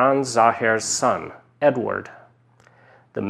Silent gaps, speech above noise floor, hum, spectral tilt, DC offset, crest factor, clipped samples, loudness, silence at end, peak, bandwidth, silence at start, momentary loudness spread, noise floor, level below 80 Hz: none; 35 dB; none; -3.5 dB/octave; under 0.1%; 20 dB; under 0.1%; -21 LUFS; 0 s; -2 dBFS; 13.5 kHz; 0 s; 16 LU; -55 dBFS; -66 dBFS